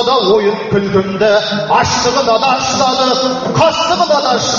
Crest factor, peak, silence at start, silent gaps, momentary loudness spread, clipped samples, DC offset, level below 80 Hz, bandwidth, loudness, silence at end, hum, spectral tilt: 12 dB; 0 dBFS; 0 s; none; 3 LU; under 0.1%; under 0.1%; -44 dBFS; 7.6 kHz; -12 LUFS; 0 s; none; -2.5 dB/octave